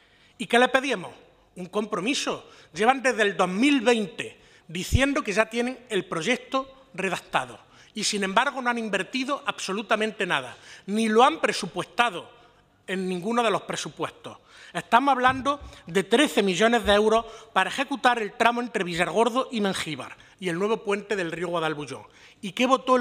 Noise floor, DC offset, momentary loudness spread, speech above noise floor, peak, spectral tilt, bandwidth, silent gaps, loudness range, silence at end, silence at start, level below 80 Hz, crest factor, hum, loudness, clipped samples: -57 dBFS; under 0.1%; 15 LU; 33 dB; -4 dBFS; -4 dB/octave; 16 kHz; none; 5 LU; 0 s; 0.4 s; -50 dBFS; 22 dB; none; -25 LUFS; under 0.1%